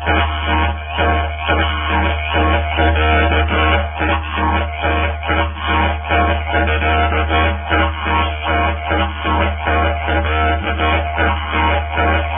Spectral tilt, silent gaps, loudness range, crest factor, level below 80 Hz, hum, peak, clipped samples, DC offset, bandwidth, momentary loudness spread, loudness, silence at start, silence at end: -11 dB/octave; none; 1 LU; 14 dB; -20 dBFS; none; 0 dBFS; under 0.1%; 0.2%; 3.7 kHz; 3 LU; -16 LUFS; 0 s; 0 s